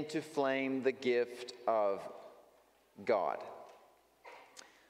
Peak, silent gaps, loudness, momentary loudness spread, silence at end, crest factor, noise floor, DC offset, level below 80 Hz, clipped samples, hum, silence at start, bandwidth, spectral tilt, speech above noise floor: -20 dBFS; none; -35 LUFS; 21 LU; 0.3 s; 18 dB; -67 dBFS; under 0.1%; -86 dBFS; under 0.1%; none; 0 s; 15.5 kHz; -5 dB/octave; 32 dB